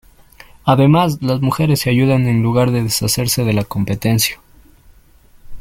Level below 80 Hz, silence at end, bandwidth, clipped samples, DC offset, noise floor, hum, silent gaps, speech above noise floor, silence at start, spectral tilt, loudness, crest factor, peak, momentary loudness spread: -42 dBFS; 0 s; 16.5 kHz; under 0.1%; under 0.1%; -47 dBFS; none; none; 32 dB; 0.65 s; -5.5 dB/octave; -15 LUFS; 16 dB; 0 dBFS; 6 LU